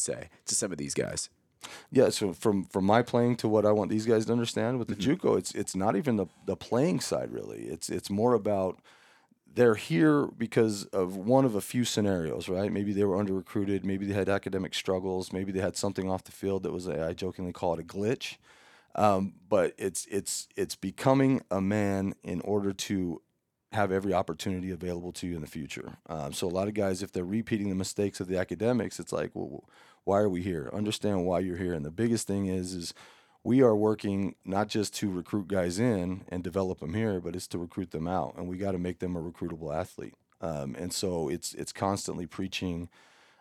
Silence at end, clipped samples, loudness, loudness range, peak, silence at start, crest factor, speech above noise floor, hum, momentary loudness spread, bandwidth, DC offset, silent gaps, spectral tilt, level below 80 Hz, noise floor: 0.55 s; under 0.1%; -30 LUFS; 7 LU; -8 dBFS; 0 s; 22 dB; 33 dB; none; 11 LU; 16.5 kHz; under 0.1%; none; -5.5 dB/octave; -64 dBFS; -62 dBFS